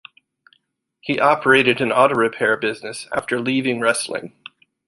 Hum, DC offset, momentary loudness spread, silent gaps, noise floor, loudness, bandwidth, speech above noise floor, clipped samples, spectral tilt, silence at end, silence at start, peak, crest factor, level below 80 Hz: none; under 0.1%; 14 LU; none; -68 dBFS; -18 LUFS; 11.5 kHz; 49 dB; under 0.1%; -4 dB/octave; 0.6 s; 1.05 s; -2 dBFS; 18 dB; -62 dBFS